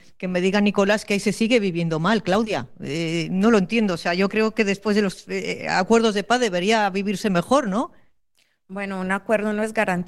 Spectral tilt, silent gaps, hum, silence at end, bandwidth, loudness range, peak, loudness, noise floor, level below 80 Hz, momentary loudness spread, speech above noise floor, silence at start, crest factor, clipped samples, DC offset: -5.5 dB/octave; none; none; 0 s; 12.5 kHz; 2 LU; -6 dBFS; -21 LUFS; -67 dBFS; -54 dBFS; 9 LU; 46 dB; 0.2 s; 16 dB; under 0.1%; 0.3%